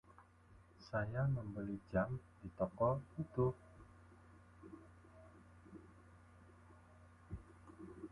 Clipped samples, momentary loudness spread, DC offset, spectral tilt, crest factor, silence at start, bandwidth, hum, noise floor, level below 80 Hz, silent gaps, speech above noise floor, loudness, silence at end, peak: under 0.1%; 25 LU; under 0.1%; -9.5 dB/octave; 22 dB; 0.1 s; 11 kHz; none; -65 dBFS; -62 dBFS; none; 25 dB; -42 LUFS; 0.05 s; -22 dBFS